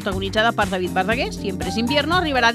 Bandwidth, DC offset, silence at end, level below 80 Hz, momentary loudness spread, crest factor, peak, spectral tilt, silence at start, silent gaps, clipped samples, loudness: 15.5 kHz; under 0.1%; 0 s; -38 dBFS; 6 LU; 18 dB; -2 dBFS; -4.5 dB/octave; 0 s; none; under 0.1%; -20 LUFS